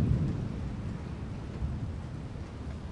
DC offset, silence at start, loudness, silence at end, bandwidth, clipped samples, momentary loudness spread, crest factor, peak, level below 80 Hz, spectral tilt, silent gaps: under 0.1%; 0 s; -37 LUFS; 0 s; 10.5 kHz; under 0.1%; 9 LU; 18 dB; -16 dBFS; -42 dBFS; -8.5 dB/octave; none